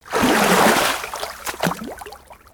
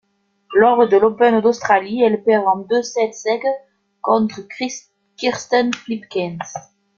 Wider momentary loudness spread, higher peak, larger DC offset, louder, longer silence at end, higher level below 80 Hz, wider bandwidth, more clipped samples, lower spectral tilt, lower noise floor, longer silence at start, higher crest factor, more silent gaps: first, 20 LU vs 13 LU; about the same, -2 dBFS vs -2 dBFS; neither; about the same, -18 LUFS vs -17 LUFS; second, 0.2 s vs 0.35 s; first, -48 dBFS vs -62 dBFS; first, over 20 kHz vs 7.4 kHz; neither; second, -3 dB/octave vs -4.5 dB/octave; second, -41 dBFS vs -49 dBFS; second, 0.05 s vs 0.5 s; about the same, 18 dB vs 16 dB; neither